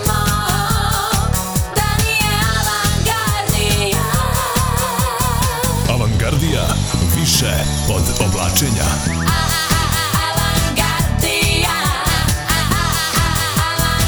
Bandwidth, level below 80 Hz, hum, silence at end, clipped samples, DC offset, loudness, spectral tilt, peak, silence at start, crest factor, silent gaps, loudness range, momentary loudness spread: over 20 kHz; -24 dBFS; none; 0 s; under 0.1%; 0.1%; -16 LUFS; -3.5 dB/octave; -2 dBFS; 0 s; 14 dB; none; 1 LU; 3 LU